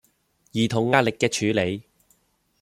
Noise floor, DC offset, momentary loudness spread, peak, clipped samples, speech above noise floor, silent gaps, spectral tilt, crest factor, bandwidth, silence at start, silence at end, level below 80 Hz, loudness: -66 dBFS; under 0.1%; 10 LU; -2 dBFS; under 0.1%; 44 dB; none; -5 dB/octave; 22 dB; 15 kHz; 0.55 s; 0.8 s; -60 dBFS; -23 LUFS